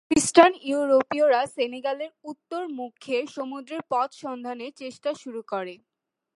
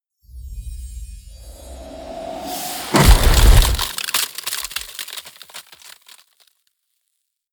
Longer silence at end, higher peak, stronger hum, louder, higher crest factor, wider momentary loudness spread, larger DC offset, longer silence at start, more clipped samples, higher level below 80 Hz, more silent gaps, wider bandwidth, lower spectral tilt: second, 0.6 s vs 1.9 s; about the same, -2 dBFS vs 0 dBFS; neither; second, -25 LUFS vs -18 LUFS; about the same, 24 dB vs 20 dB; second, 17 LU vs 27 LU; neither; second, 0.1 s vs 0.35 s; neither; second, -62 dBFS vs -22 dBFS; neither; second, 11.5 kHz vs over 20 kHz; about the same, -3 dB/octave vs -3.5 dB/octave